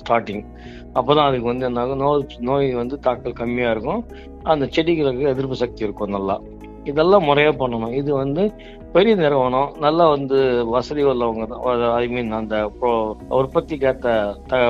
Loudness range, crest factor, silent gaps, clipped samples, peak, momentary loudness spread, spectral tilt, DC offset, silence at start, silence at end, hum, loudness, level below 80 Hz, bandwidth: 4 LU; 18 dB; none; under 0.1%; -2 dBFS; 9 LU; -7.5 dB/octave; under 0.1%; 0 s; 0 s; none; -20 LUFS; -42 dBFS; 7.4 kHz